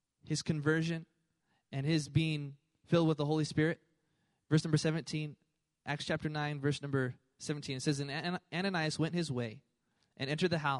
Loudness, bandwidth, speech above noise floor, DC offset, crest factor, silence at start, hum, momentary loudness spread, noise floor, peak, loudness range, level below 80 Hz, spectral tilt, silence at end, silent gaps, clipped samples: -35 LUFS; 11.5 kHz; 45 dB; under 0.1%; 20 dB; 0.25 s; none; 10 LU; -79 dBFS; -16 dBFS; 3 LU; -68 dBFS; -5.5 dB/octave; 0 s; none; under 0.1%